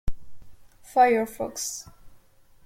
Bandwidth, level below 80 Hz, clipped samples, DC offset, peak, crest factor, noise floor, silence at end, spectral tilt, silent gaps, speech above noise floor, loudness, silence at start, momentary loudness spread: 16.5 kHz; -42 dBFS; under 0.1%; under 0.1%; -8 dBFS; 20 dB; -54 dBFS; 0.5 s; -3.5 dB/octave; none; 31 dB; -24 LUFS; 0.05 s; 17 LU